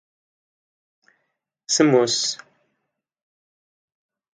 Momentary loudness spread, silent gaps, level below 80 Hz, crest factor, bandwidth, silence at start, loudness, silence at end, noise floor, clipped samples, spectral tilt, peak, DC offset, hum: 10 LU; none; -76 dBFS; 22 dB; 9.6 kHz; 1.7 s; -19 LUFS; 2 s; -78 dBFS; under 0.1%; -3 dB/octave; -4 dBFS; under 0.1%; none